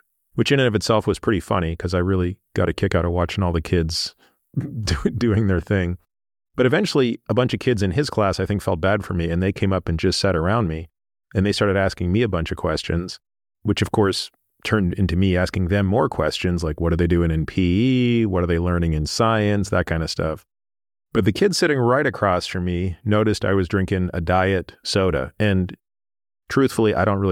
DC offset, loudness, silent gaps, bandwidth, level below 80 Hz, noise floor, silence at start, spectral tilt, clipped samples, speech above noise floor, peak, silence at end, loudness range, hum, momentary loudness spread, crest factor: under 0.1%; -21 LUFS; none; 14 kHz; -38 dBFS; under -90 dBFS; 0.35 s; -6 dB/octave; under 0.1%; over 70 dB; -6 dBFS; 0 s; 3 LU; none; 7 LU; 16 dB